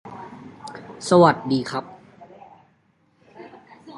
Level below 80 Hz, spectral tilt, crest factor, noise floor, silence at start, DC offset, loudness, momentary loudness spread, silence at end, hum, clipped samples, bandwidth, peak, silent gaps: -64 dBFS; -6 dB/octave; 24 dB; -63 dBFS; 0.05 s; under 0.1%; -19 LUFS; 29 LU; 0 s; none; under 0.1%; 11.5 kHz; 0 dBFS; none